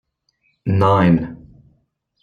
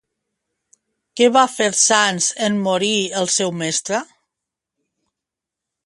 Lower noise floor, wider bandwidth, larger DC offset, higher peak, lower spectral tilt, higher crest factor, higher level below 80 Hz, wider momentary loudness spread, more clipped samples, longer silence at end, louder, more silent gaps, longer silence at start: second, -66 dBFS vs -85 dBFS; second, 6.8 kHz vs 11.5 kHz; neither; about the same, -2 dBFS vs 0 dBFS; first, -9 dB/octave vs -2 dB/octave; about the same, 18 dB vs 20 dB; first, -48 dBFS vs -68 dBFS; first, 16 LU vs 8 LU; neither; second, 0.85 s vs 1.8 s; about the same, -16 LUFS vs -17 LUFS; neither; second, 0.65 s vs 1.15 s